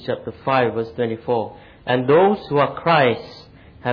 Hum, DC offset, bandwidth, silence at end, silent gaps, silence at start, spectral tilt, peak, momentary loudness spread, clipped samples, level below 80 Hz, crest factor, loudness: none; under 0.1%; 5.4 kHz; 0 s; none; 0 s; -8.5 dB/octave; -4 dBFS; 13 LU; under 0.1%; -54 dBFS; 16 dB; -19 LUFS